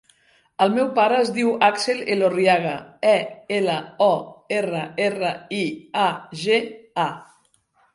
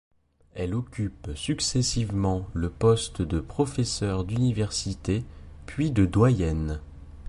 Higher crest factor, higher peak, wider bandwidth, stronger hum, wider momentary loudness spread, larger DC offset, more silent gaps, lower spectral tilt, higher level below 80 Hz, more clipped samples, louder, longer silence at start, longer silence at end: about the same, 20 dB vs 18 dB; first, -2 dBFS vs -8 dBFS; about the same, 11.5 kHz vs 11.5 kHz; neither; second, 8 LU vs 12 LU; neither; neither; about the same, -4.5 dB/octave vs -5.5 dB/octave; second, -68 dBFS vs -38 dBFS; neither; first, -21 LUFS vs -27 LUFS; about the same, 0.6 s vs 0.55 s; first, 0.7 s vs 0 s